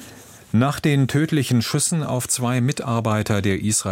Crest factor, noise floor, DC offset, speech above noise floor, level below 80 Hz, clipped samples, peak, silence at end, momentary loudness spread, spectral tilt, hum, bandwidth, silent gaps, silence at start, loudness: 16 dB; -43 dBFS; under 0.1%; 23 dB; -52 dBFS; under 0.1%; -6 dBFS; 0 s; 3 LU; -5 dB/octave; none; 16.5 kHz; none; 0 s; -20 LUFS